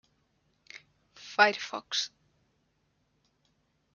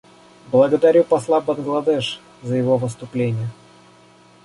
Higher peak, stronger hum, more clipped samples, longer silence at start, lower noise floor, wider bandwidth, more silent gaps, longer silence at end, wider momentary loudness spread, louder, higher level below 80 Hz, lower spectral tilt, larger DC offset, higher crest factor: second, -6 dBFS vs -2 dBFS; neither; neither; first, 0.75 s vs 0.5 s; first, -74 dBFS vs -49 dBFS; second, 7.2 kHz vs 11.5 kHz; neither; first, 1.9 s vs 0.9 s; first, 26 LU vs 13 LU; second, -28 LUFS vs -19 LUFS; second, -82 dBFS vs -60 dBFS; second, -1 dB/octave vs -7 dB/octave; neither; first, 30 dB vs 18 dB